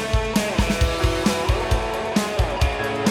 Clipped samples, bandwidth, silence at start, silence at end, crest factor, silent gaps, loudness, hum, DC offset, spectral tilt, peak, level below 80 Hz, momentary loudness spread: under 0.1%; 16.5 kHz; 0 s; 0 s; 18 dB; none; -22 LUFS; none; under 0.1%; -5 dB/octave; -4 dBFS; -26 dBFS; 2 LU